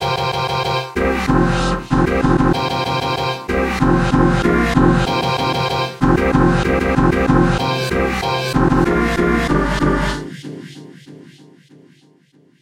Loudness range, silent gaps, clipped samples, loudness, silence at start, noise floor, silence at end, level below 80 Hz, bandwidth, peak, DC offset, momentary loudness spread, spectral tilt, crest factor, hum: 4 LU; none; under 0.1%; -16 LUFS; 0 s; -53 dBFS; 1.4 s; -28 dBFS; 16 kHz; 0 dBFS; under 0.1%; 5 LU; -6 dB/octave; 16 dB; none